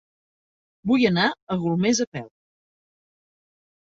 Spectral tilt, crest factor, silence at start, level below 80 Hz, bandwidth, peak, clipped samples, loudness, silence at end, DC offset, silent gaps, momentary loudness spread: -4.5 dB/octave; 20 dB; 0.85 s; -62 dBFS; 7.8 kHz; -6 dBFS; under 0.1%; -22 LUFS; 1.6 s; under 0.1%; 1.42-1.47 s, 2.07-2.12 s; 12 LU